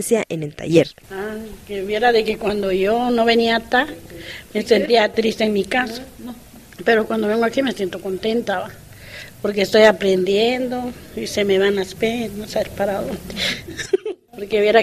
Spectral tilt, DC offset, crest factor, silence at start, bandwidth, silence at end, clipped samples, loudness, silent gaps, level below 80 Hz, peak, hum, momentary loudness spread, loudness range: -4.5 dB/octave; under 0.1%; 20 dB; 0 s; 15 kHz; 0 s; under 0.1%; -19 LUFS; none; -48 dBFS; 0 dBFS; none; 16 LU; 4 LU